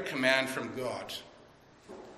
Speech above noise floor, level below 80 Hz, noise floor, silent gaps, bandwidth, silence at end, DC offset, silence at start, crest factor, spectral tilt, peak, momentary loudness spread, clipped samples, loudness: 26 dB; -70 dBFS; -58 dBFS; none; 14.5 kHz; 0 s; under 0.1%; 0 s; 22 dB; -3.5 dB/octave; -12 dBFS; 21 LU; under 0.1%; -32 LUFS